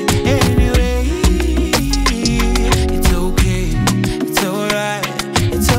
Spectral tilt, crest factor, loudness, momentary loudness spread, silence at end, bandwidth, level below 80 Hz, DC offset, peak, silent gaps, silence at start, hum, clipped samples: -4.5 dB/octave; 12 dB; -16 LUFS; 4 LU; 0 s; 16.5 kHz; -18 dBFS; under 0.1%; -2 dBFS; none; 0 s; none; under 0.1%